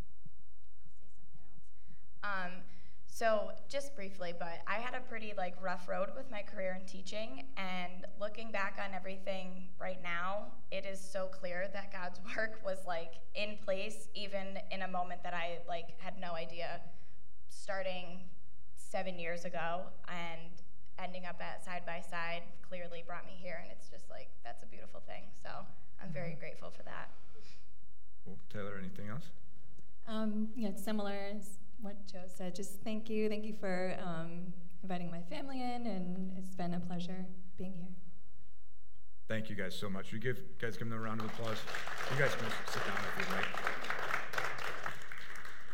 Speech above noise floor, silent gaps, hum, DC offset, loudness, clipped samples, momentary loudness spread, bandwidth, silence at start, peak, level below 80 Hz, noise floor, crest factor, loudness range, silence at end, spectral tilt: 25 dB; none; none; 3%; -42 LUFS; under 0.1%; 14 LU; 16.5 kHz; 0 s; -16 dBFS; -68 dBFS; -67 dBFS; 26 dB; 11 LU; 0 s; -5 dB/octave